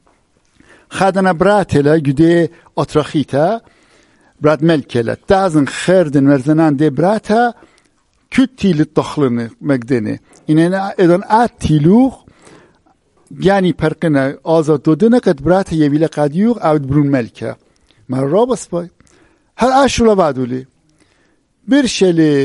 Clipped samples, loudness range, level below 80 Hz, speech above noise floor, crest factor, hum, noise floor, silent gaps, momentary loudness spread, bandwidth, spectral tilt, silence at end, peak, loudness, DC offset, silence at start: under 0.1%; 3 LU; -42 dBFS; 45 dB; 14 dB; none; -57 dBFS; none; 8 LU; 11.5 kHz; -6.5 dB/octave; 0 s; 0 dBFS; -13 LUFS; under 0.1%; 0.9 s